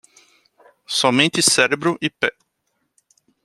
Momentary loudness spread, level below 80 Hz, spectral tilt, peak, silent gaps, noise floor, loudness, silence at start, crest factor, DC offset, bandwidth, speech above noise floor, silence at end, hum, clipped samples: 9 LU; -64 dBFS; -2.5 dB/octave; 0 dBFS; none; -72 dBFS; -17 LUFS; 0.9 s; 22 dB; under 0.1%; 15.5 kHz; 54 dB; 1.15 s; none; under 0.1%